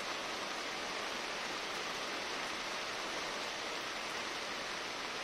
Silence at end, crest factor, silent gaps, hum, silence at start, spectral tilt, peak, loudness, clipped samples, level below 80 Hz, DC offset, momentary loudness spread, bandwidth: 0 s; 18 dB; none; none; 0 s; -1 dB/octave; -22 dBFS; -39 LUFS; under 0.1%; -68 dBFS; under 0.1%; 1 LU; 16 kHz